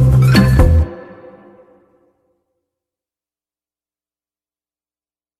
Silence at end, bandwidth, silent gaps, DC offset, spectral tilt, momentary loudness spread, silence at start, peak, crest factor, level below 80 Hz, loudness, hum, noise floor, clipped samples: 4.4 s; 14.5 kHz; none; under 0.1%; -7.5 dB/octave; 15 LU; 0 s; 0 dBFS; 16 dB; -24 dBFS; -12 LUFS; none; under -90 dBFS; under 0.1%